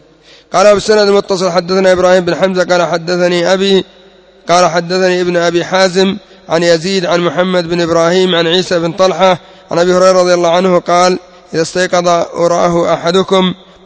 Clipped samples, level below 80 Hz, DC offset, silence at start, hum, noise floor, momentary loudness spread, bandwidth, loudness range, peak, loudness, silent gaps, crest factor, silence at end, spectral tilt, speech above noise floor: 0.3%; -48 dBFS; under 0.1%; 0.5 s; none; -42 dBFS; 6 LU; 8 kHz; 2 LU; 0 dBFS; -11 LUFS; none; 10 dB; 0.3 s; -4.5 dB/octave; 32 dB